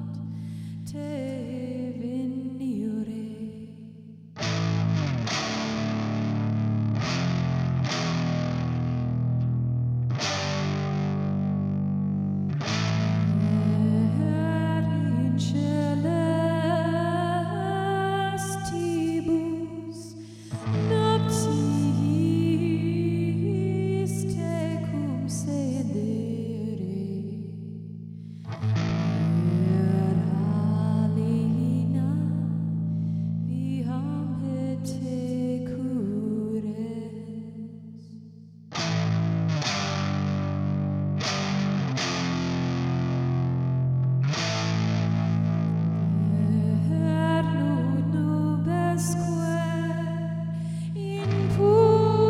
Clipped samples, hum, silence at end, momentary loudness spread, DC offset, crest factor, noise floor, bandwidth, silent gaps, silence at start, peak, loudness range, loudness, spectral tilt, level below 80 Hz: under 0.1%; none; 0 s; 10 LU; under 0.1%; 18 dB; -46 dBFS; 12 kHz; none; 0 s; -8 dBFS; 6 LU; -26 LUFS; -7 dB/octave; -56 dBFS